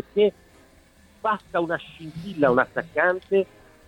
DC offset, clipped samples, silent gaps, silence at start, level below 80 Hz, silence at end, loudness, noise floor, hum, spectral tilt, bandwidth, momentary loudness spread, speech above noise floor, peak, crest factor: under 0.1%; under 0.1%; none; 0.15 s; -58 dBFS; 0.45 s; -24 LUFS; -55 dBFS; none; -7 dB/octave; 10.5 kHz; 13 LU; 31 dB; -4 dBFS; 20 dB